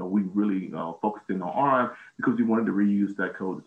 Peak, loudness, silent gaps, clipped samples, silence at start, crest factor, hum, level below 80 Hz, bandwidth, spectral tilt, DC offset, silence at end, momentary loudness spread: -10 dBFS; -26 LUFS; none; under 0.1%; 0 s; 16 dB; none; -72 dBFS; 3.8 kHz; -9 dB/octave; under 0.1%; 0.05 s; 7 LU